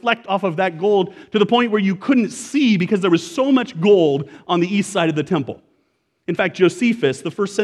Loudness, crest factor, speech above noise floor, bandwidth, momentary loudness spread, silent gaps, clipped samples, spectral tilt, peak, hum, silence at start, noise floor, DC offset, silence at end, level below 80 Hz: -18 LUFS; 16 dB; 49 dB; 12 kHz; 7 LU; none; under 0.1%; -5.5 dB/octave; -2 dBFS; none; 0.05 s; -66 dBFS; under 0.1%; 0 s; -66 dBFS